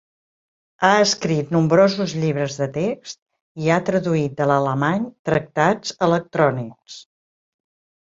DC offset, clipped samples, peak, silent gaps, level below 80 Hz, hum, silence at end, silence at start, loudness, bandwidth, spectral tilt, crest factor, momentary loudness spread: under 0.1%; under 0.1%; -2 dBFS; 3.22-3.26 s, 3.41-3.55 s, 5.19-5.25 s; -58 dBFS; none; 1 s; 0.8 s; -20 LUFS; 7.8 kHz; -5.5 dB/octave; 20 dB; 16 LU